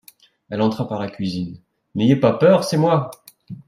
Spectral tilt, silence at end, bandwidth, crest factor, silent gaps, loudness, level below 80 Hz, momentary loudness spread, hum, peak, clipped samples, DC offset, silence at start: -7 dB/octave; 0.1 s; 15.5 kHz; 18 dB; none; -19 LUFS; -60 dBFS; 16 LU; none; -2 dBFS; under 0.1%; under 0.1%; 0.5 s